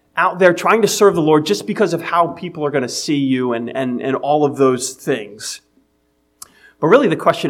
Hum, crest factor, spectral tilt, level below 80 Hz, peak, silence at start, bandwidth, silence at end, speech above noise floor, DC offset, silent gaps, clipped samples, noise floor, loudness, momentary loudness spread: none; 16 dB; -4.5 dB/octave; -64 dBFS; 0 dBFS; 0.15 s; 16.5 kHz; 0 s; 46 dB; under 0.1%; none; under 0.1%; -62 dBFS; -16 LUFS; 10 LU